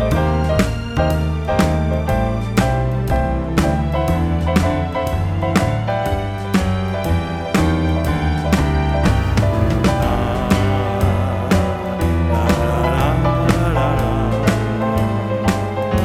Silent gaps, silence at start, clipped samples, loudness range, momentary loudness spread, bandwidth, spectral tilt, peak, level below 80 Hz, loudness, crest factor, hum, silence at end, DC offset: none; 0 s; under 0.1%; 2 LU; 3 LU; 16 kHz; -7 dB/octave; 0 dBFS; -24 dBFS; -18 LUFS; 16 dB; none; 0 s; under 0.1%